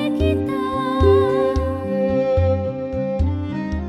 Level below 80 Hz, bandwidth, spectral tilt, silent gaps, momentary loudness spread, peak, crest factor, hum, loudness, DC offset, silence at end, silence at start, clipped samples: -30 dBFS; 11.5 kHz; -8.5 dB/octave; none; 9 LU; -4 dBFS; 16 dB; none; -20 LUFS; under 0.1%; 0 s; 0 s; under 0.1%